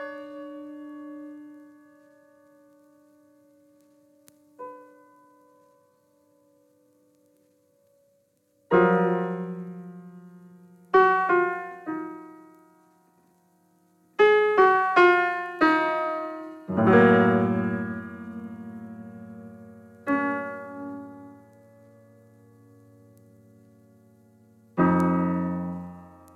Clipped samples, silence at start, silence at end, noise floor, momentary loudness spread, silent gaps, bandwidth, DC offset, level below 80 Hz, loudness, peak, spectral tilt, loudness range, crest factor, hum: under 0.1%; 0 s; 0.3 s; -67 dBFS; 25 LU; none; 8.6 kHz; under 0.1%; -66 dBFS; -23 LUFS; -6 dBFS; -8 dB/octave; 13 LU; 20 dB; none